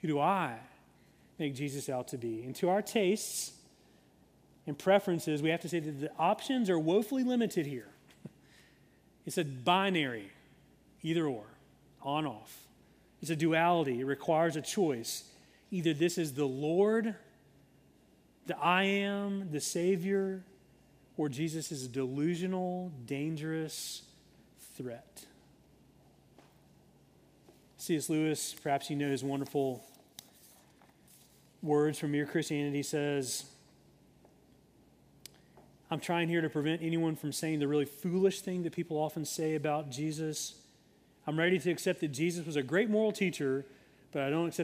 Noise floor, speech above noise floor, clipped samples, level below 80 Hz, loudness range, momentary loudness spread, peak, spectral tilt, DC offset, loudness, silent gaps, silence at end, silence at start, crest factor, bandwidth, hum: -65 dBFS; 32 dB; under 0.1%; -74 dBFS; 7 LU; 16 LU; -14 dBFS; -5 dB/octave; under 0.1%; -33 LUFS; none; 0 s; 0.05 s; 20 dB; 15.5 kHz; none